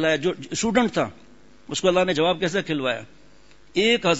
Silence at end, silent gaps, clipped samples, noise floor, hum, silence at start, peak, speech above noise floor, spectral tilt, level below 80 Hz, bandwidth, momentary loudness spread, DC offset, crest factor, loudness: 0 s; none; under 0.1%; -54 dBFS; none; 0 s; -6 dBFS; 32 dB; -4 dB/octave; -54 dBFS; 8 kHz; 9 LU; 0.4%; 16 dB; -23 LUFS